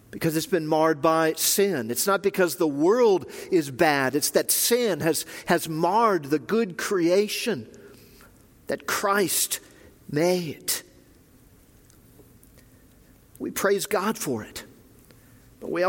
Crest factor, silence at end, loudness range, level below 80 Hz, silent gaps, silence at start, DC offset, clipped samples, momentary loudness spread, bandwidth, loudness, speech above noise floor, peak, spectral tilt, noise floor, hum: 20 dB; 0 s; 9 LU; -62 dBFS; none; 0.15 s; under 0.1%; under 0.1%; 10 LU; 17 kHz; -24 LUFS; 31 dB; -6 dBFS; -3.5 dB/octave; -55 dBFS; none